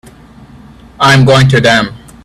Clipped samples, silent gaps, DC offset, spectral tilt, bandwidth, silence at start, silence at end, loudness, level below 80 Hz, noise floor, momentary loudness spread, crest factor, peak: 0.1%; none; under 0.1%; -5.5 dB/octave; 13 kHz; 1 s; 0.3 s; -7 LUFS; -38 dBFS; -36 dBFS; 6 LU; 10 dB; 0 dBFS